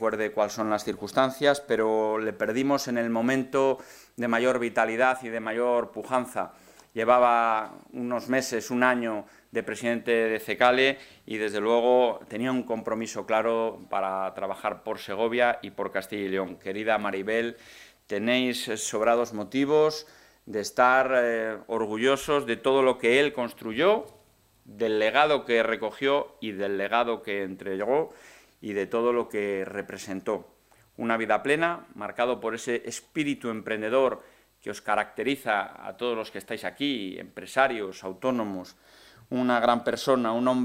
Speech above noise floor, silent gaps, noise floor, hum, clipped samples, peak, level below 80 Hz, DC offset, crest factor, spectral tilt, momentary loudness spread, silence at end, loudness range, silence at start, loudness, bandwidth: 35 dB; none; -61 dBFS; none; under 0.1%; -4 dBFS; -66 dBFS; under 0.1%; 22 dB; -4 dB/octave; 12 LU; 0 s; 5 LU; 0 s; -26 LUFS; 16 kHz